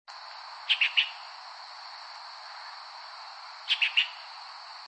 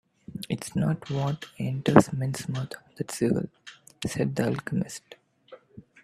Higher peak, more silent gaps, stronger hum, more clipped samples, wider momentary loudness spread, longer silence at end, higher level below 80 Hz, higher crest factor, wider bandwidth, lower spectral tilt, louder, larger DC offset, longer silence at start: second, -12 dBFS vs 0 dBFS; neither; neither; neither; about the same, 19 LU vs 19 LU; second, 0 s vs 0.2 s; second, under -90 dBFS vs -60 dBFS; second, 22 dB vs 28 dB; second, 8.8 kHz vs 14.5 kHz; second, 7 dB/octave vs -6.5 dB/octave; about the same, -26 LUFS vs -28 LUFS; neither; second, 0.1 s vs 0.3 s